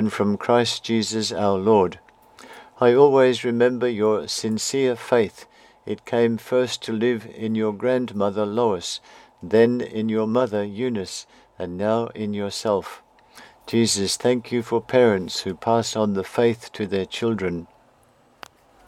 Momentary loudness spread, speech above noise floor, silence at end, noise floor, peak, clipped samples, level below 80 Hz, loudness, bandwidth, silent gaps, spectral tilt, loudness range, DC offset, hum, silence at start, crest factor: 10 LU; 36 dB; 1.25 s; -57 dBFS; -2 dBFS; under 0.1%; -62 dBFS; -22 LUFS; 14.5 kHz; none; -4.5 dB/octave; 5 LU; under 0.1%; none; 0 s; 20 dB